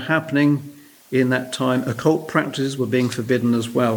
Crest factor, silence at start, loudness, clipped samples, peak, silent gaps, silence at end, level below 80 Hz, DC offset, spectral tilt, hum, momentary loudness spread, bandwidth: 18 dB; 0 s; -20 LUFS; under 0.1%; -2 dBFS; none; 0 s; -64 dBFS; under 0.1%; -6 dB/octave; none; 5 LU; over 20 kHz